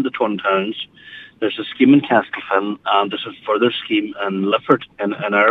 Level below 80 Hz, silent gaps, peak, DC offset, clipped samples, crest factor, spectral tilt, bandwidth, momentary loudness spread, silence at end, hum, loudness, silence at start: -66 dBFS; none; 0 dBFS; under 0.1%; under 0.1%; 18 dB; -7.5 dB/octave; 4.1 kHz; 12 LU; 0 s; none; -18 LUFS; 0 s